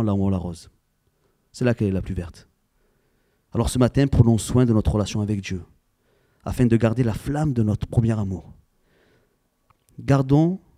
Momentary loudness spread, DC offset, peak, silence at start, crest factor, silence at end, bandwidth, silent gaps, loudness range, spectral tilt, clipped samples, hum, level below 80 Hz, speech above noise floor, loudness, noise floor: 14 LU; under 0.1%; -2 dBFS; 0 s; 20 dB; 0.2 s; 14.5 kHz; none; 6 LU; -7.5 dB/octave; under 0.1%; none; -38 dBFS; 46 dB; -22 LUFS; -67 dBFS